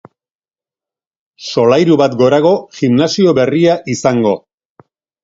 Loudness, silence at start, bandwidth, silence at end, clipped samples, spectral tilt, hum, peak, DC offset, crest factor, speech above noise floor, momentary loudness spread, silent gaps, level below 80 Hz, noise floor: -12 LUFS; 1.4 s; 7.8 kHz; 0.85 s; under 0.1%; -6 dB/octave; none; 0 dBFS; under 0.1%; 14 dB; over 79 dB; 6 LU; none; -54 dBFS; under -90 dBFS